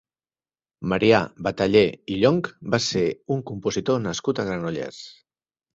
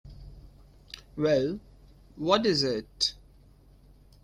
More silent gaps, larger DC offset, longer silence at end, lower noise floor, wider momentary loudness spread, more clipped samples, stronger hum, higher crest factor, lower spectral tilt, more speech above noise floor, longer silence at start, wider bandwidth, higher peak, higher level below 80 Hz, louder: neither; neither; second, 0.65 s vs 1.1 s; first, under -90 dBFS vs -56 dBFS; second, 12 LU vs 22 LU; neither; neither; about the same, 20 dB vs 24 dB; about the same, -5.5 dB/octave vs -4.5 dB/octave; first, over 68 dB vs 30 dB; first, 0.8 s vs 0.05 s; second, 8 kHz vs 14.5 kHz; about the same, -4 dBFS vs -6 dBFS; about the same, -54 dBFS vs -54 dBFS; first, -23 LUFS vs -27 LUFS